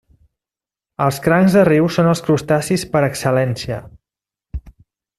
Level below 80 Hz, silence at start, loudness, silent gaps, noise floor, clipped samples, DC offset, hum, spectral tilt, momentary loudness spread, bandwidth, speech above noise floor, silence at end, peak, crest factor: -42 dBFS; 1 s; -16 LUFS; none; -90 dBFS; under 0.1%; under 0.1%; none; -6.5 dB/octave; 21 LU; 14 kHz; 75 dB; 0.5 s; -2 dBFS; 16 dB